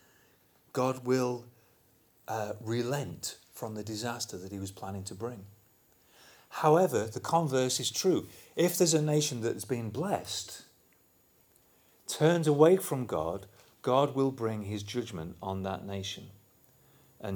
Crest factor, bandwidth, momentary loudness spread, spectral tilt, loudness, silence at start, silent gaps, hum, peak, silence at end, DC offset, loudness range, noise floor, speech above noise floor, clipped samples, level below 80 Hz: 22 dB; over 20 kHz; 15 LU; -5 dB/octave; -31 LUFS; 0.75 s; none; none; -8 dBFS; 0 s; under 0.1%; 8 LU; -66 dBFS; 36 dB; under 0.1%; -68 dBFS